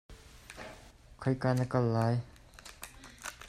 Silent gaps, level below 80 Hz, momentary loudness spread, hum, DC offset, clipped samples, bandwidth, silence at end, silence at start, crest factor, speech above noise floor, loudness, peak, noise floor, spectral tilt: none; -58 dBFS; 22 LU; none; under 0.1%; under 0.1%; 15 kHz; 0 s; 0.1 s; 18 dB; 25 dB; -32 LUFS; -16 dBFS; -54 dBFS; -7 dB/octave